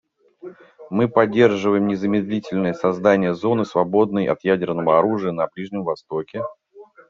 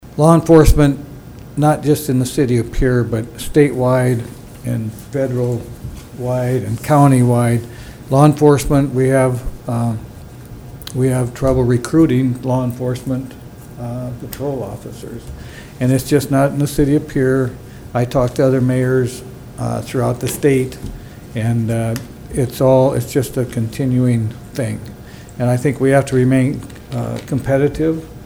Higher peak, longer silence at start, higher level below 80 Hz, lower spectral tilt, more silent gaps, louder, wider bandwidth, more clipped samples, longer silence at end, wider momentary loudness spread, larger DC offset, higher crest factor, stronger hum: about the same, -2 dBFS vs 0 dBFS; first, 0.45 s vs 0.05 s; second, -62 dBFS vs -32 dBFS; about the same, -6 dB/octave vs -7 dB/octave; neither; second, -20 LUFS vs -16 LUFS; second, 7.4 kHz vs over 20 kHz; neither; first, 0.25 s vs 0 s; second, 11 LU vs 19 LU; neither; about the same, 18 dB vs 16 dB; neither